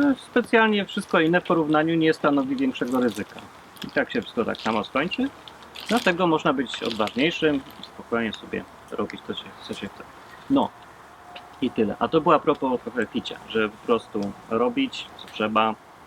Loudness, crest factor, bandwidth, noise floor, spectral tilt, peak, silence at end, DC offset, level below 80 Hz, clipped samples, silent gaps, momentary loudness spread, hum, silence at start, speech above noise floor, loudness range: -24 LUFS; 20 dB; 15.5 kHz; -46 dBFS; -5.5 dB/octave; -4 dBFS; 0 s; under 0.1%; -60 dBFS; under 0.1%; none; 17 LU; none; 0 s; 22 dB; 7 LU